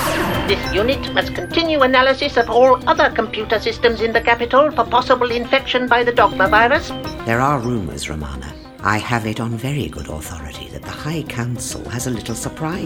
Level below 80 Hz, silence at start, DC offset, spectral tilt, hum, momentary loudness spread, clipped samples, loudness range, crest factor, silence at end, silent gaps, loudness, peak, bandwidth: -36 dBFS; 0 s; under 0.1%; -4.5 dB/octave; none; 14 LU; under 0.1%; 9 LU; 16 dB; 0 s; none; -17 LUFS; 0 dBFS; over 20 kHz